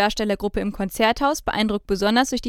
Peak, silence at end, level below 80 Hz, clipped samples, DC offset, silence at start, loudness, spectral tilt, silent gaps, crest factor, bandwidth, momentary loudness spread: -4 dBFS; 0 s; -40 dBFS; under 0.1%; under 0.1%; 0 s; -22 LUFS; -4 dB/octave; none; 18 dB; 17 kHz; 7 LU